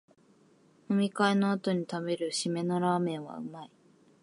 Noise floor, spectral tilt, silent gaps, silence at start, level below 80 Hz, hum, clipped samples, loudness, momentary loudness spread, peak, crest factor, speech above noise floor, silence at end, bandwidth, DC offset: -63 dBFS; -5.5 dB/octave; none; 0.9 s; -80 dBFS; none; under 0.1%; -30 LUFS; 15 LU; -12 dBFS; 20 dB; 33 dB; 0.55 s; 11.5 kHz; under 0.1%